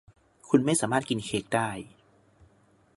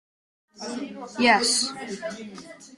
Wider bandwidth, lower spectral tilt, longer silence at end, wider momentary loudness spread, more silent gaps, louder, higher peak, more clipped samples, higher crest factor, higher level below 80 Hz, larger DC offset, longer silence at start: about the same, 11.5 kHz vs 12.5 kHz; first, -4.5 dB/octave vs -1.5 dB/octave; first, 1.1 s vs 0 s; second, 13 LU vs 20 LU; neither; second, -27 LUFS vs -23 LUFS; about the same, -8 dBFS vs -6 dBFS; neither; about the same, 22 dB vs 22 dB; first, -62 dBFS vs -68 dBFS; neither; about the same, 0.45 s vs 0.55 s